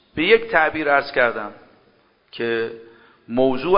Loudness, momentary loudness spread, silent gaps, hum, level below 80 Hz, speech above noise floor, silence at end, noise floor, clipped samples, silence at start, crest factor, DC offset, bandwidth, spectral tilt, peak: -19 LUFS; 17 LU; none; none; -54 dBFS; 39 dB; 0 s; -58 dBFS; under 0.1%; 0.15 s; 20 dB; under 0.1%; 5.4 kHz; -8.5 dB/octave; 0 dBFS